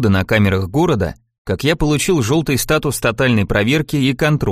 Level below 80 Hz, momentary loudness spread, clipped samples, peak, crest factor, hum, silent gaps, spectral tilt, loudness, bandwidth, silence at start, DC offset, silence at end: -34 dBFS; 5 LU; under 0.1%; 0 dBFS; 14 dB; none; 1.38-1.45 s; -5.5 dB/octave; -16 LUFS; 15.5 kHz; 0 s; under 0.1%; 0 s